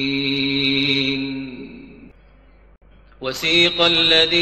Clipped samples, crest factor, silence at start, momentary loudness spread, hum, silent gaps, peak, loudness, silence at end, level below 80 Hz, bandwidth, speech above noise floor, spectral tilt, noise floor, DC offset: under 0.1%; 18 dB; 0 s; 18 LU; none; none; -2 dBFS; -16 LUFS; 0 s; -48 dBFS; 13 kHz; 32 dB; -4 dB/octave; -49 dBFS; 0.1%